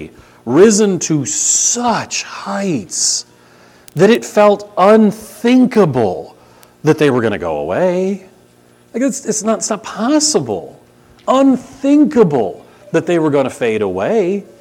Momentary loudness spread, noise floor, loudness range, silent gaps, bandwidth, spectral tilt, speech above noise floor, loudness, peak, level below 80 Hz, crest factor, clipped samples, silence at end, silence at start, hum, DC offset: 10 LU; -48 dBFS; 5 LU; none; 16.5 kHz; -4 dB/octave; 35 dB; -14 LUFS; 0 dBFS; -54 dBFS; 14 dB; under 0.1%; 0.15 s; 0 s; 60 Hz at -45 dBFS; under 0.1%